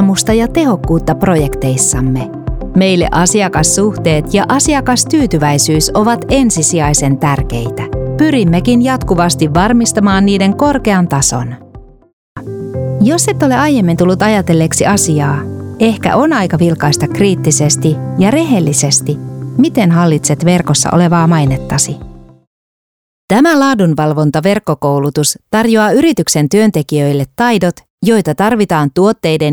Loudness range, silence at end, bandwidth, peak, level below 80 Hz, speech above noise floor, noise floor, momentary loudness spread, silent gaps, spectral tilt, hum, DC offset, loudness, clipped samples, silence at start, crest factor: 2 LU; 0 s; 19 kHz; 0 dBFS; -30 dBFS; 25 dB; -36 dBFS; 6 LU; 12.13-12.35 s, 22.47-23.28 s, 27.90-27.98 s; -5 dB/octave; none; under 0.1%; -11 LUFS; under 0.1%; 0 s; 10 dB